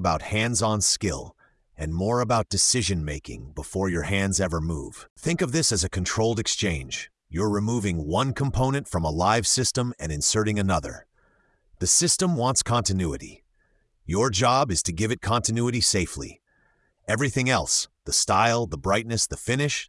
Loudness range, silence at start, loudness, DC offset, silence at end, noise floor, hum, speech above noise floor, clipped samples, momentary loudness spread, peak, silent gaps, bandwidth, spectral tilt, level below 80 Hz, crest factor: 2 LU; 0 s; -24 LUFS; under 0.1%; 0.05 s; -66 dBFS; none; 42 dB; under 0.1%; 12 LU; -6 dBFS; 5.10-5.16 s; 12 kHz; -3.5 dB/octave; -44 dBFS; 18 dB